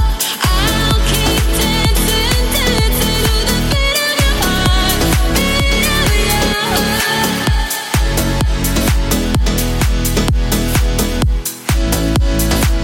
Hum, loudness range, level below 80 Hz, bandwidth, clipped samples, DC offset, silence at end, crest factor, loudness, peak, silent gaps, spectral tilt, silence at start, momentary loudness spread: none; 2 LU; -16 dBFS; 17 kHz; under 0.1%; under 0.1%; 0 s; 12 dB; -14 LUFS; 0 dBFS; none; -4 dB/octave; 0 s; 3 LU